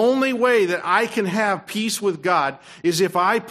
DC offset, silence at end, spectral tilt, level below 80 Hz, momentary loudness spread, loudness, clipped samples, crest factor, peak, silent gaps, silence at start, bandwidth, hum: under 0.1%; 0 s; -4 dB/octave; -68 dBFS; 6 LU; -20 LUFS; under 0.1%; 16 dB; -4 dBFS; none; 0 s; 15 kHz; none